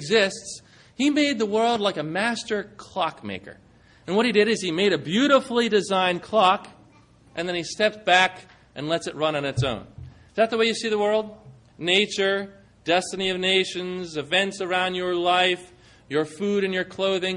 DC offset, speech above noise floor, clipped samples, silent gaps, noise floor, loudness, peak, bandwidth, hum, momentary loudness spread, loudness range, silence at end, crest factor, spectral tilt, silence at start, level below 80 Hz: under 0.1%; 31 dB; under 0.1%; none; -54 dBFS; -23 LUFS; -4 dBFS; 11 kHz; none; 13 LU; 3 LU; 0 s; 20 dB; -4 dB/octave; 0 s; -58 dBFS